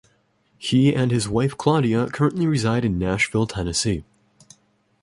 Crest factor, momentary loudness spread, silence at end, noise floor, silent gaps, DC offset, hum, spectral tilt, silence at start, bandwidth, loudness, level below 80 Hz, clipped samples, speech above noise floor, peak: 18 dB; 5 LU; 1 s; -63 dBFS; none; under 0.1%; none; -5.5 dB/octave; 0.6 s; 11.5 kHz; -21 LUFS; -44 dBFS; under 0.1%; 43 dB; -4 dBFS